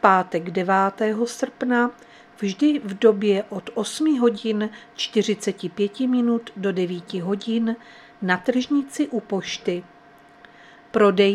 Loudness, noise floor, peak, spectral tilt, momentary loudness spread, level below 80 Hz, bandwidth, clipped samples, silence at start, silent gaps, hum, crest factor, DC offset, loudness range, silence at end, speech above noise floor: -23 LUFS; -50 dBFS; 0 dBFS; -5 dB/octave; 9 LU; -68 dBFS; 13 kHz; under 0.1%; 0.05 s; none; none; 22 dB; under 0.1%; 3 LU; 0 s; 28 dB